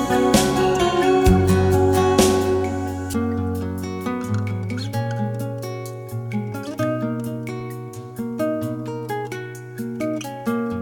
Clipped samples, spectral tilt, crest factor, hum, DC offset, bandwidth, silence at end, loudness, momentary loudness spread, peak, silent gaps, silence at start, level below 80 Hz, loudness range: under 0.1%; -6 dB/octave; 18 dB; none; under 0.1%; 19.5 kHz; 0 s; -22 LUFS; 14 LU; -4 dBFS; none; 0 s; -38 dBFS; 9 LU